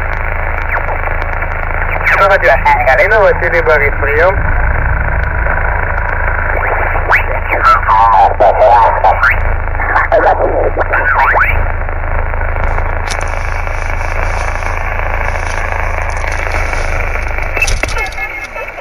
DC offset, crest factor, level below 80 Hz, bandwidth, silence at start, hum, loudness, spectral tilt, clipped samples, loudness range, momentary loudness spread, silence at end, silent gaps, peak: under 0.1%; 10 dB; -16 dBFS; 14 kHz; 0 s; none; -12 LUFS; -5 dB/octave; under 0.1%; 8 LU; 10 LU; 0 s; none; 0 dBFS